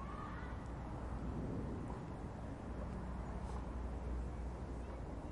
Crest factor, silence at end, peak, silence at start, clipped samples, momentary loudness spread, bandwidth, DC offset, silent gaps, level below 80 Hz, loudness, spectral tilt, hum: 14 dB; 0 s; -30 dBFS; 0 s; under 0.1%; 4 LU; 11 kHz; under 0.1%; none; -48 dBFS; -46 LUFS; -8 dB/octave; none